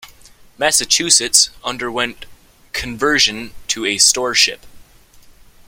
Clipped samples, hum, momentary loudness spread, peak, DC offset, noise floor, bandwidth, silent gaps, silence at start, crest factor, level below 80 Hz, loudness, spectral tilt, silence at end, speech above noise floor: under 0.1%; none; 14 LU; 0 dBFS; under 0.1%; -45 dBFS; 17 kHz; none; 0.05 s; 18 dB; -46 dBFS; -14 LUFS; 0 dB/octave; 0.45 s; 28 dB